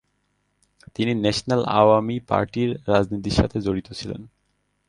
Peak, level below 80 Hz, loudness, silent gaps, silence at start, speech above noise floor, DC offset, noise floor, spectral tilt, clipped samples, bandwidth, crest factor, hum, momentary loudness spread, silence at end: -2 dBFS; -42 dBFS; -22 LUFS; none; 1 s; 49 dB; under 0.1%; -70 dBFS; -6 dB/octave; under 0.1%; 11.5 kHz; 20 dB; 50 Hz at -45 dBFS; 15 LU; 0.6 s